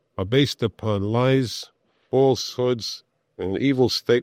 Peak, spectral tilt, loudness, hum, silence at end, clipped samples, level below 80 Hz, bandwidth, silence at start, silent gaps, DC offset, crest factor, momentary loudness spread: -6 dBFS; -6 dB/octave; -22 LUFS; none; 0 s; under 0.1%; -60 dBFS; 15.5 kHz; 0.2 s; none; under 0.1%; 16 dB; 12 LU